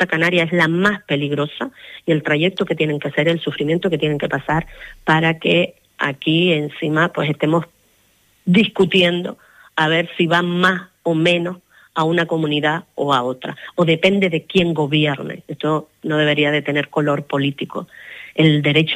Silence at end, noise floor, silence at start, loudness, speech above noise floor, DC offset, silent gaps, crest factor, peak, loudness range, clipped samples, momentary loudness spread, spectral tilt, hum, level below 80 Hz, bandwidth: 0 s; -58 dBFS; 0 s; -18 LUFS; 40 dB; under 0.1%; none; 16 dB; -2 dBFS; 2 LU; under 0.1%; 11 LU; -6.5 dB/octave; none; -52 dBFS; 12.5 kHz